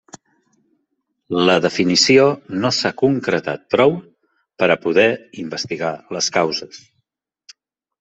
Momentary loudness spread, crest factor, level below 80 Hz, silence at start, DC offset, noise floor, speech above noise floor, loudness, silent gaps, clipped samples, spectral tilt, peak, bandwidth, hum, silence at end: 13 LU; 18 dB; -60 dBFS; 1.3 s; under 0.1%; -72 dBFS; 55 dB; -17 LUFS; none; under 0.1%; -4 dB/octave; -2 dBFS; 8.2 kHz; none; 1.25 s